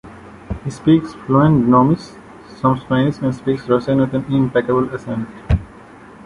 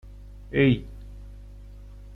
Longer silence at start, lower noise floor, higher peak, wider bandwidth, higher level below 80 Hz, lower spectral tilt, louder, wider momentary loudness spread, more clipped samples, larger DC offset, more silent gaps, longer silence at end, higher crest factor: about the same, 0.05 s vs 0.05 s; about the same, -40 dBFS vs -43 dBFS; first, -2 dBFS vs -8 dBFS; first, 11 kHz vs 5.4 kHz; first, -34 dBFS vs -42 dBFS; about the same, -8.5 dB/octave vs -9 dB/octave; first, -17 LUFS vs -24 LUFS; second, 13 LU vs 25 LU; neither; neither; neither; about the same, 0.05 s vs 0 s; about the same, 16 dB vs 20 dB